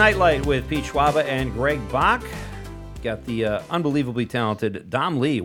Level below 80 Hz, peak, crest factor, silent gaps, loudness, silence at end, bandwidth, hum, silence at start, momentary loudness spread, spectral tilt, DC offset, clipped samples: -38 dBFS; -2 dBFS; 20 dB; none; -22 LUFS; 0 s; 18.5 kHz; none; 0 s; 12 LU; -6 dB/octave; under 0.1%; under 0.1%